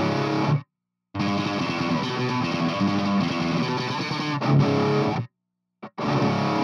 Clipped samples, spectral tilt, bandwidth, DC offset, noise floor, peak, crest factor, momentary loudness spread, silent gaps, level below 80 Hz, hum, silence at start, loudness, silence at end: under 0.1%; -6.5 dB/octave; 7.4 kHz; under 0.1%; -81 dBFS; -8 dBFS; 16 dB; 7 LU; none; -58 dBFS; none; 0 s; -24 LUFS; 0 s